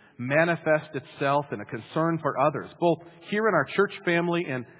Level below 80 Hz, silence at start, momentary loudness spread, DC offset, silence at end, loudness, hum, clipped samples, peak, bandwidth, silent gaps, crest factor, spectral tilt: -70 dBFS; 0.2 s; 8 LU; under 0.1%; 0.15 s; -26 LUFS; none; under 0.1%; -8 dBFS; 4 kHz; none; 18 dB; -10 dB/octave